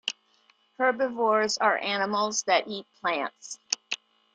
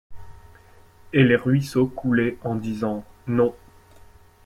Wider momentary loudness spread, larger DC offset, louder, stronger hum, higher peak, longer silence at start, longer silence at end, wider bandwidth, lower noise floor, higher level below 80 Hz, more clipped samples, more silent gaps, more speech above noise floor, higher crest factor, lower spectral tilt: about the same, 12 LU vs 10 LU; neither; second, -27 LUFS vs -22 LUFS; neither; about the same, -4 dBFS vs -6 dBFS; about the same, 0.05 s vs 0.1 s; second, 0.4 s vs 0.9 s; second, 10 kHz vs 14.5 kHz; first, -65 dBFS vs -50 dBFS; second, -76 dBFS vs -52 dBFS; neither; neither; first, 38 dB vs 29 dB; first, 26 dB vs 18 dB; second, -1.5 dB/octave vs -7.5 dB/octave